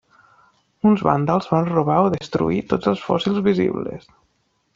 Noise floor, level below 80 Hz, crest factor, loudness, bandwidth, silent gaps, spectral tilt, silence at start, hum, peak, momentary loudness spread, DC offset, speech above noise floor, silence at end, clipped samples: -67 dBFS; -52 dBFS; 18 dB; -20 LUFS; 7.4 kHz; none; -8 dB/octave; 0.85 s; none; -2 dBFS; 5 LU; under 0.1%; 48 dB; 0.75 s; under 0.1%